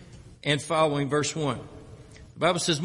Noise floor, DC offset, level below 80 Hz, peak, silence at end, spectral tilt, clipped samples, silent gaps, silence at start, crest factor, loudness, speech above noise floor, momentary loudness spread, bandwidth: -47 dBFS; under 0.1%; -56 dBFS; -10 dBFS; 0 s; -4 dB/octave; under 0.1%; none; 0 s; 18 dB; -26 LUFS; 22 dB; 13 LU; 11.5 kHz